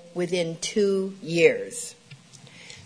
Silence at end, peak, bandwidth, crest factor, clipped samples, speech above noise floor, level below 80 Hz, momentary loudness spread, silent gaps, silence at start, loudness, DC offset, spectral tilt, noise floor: 0.05 s; -4 dBFS; 11 kHz; 22 dB; under 0.1%; 24 dB; -68 dBFS; 17 LU; none; 0.05 s; -25 LUFS; under 0.1%; -4 dB/octave; -48 dBFS